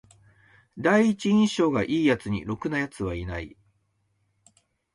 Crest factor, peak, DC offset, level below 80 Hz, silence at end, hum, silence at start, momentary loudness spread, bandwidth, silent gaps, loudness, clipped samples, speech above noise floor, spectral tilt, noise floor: 18 dB; -8 dBFS; under 0.1%; -50 dBFS; 1.45 s; none; 0.75 s; 12 LU; 11.5 kHz; none; -25 LUFS; under 0.1%; 47 dB; -6 dB/octave; -71 dBFS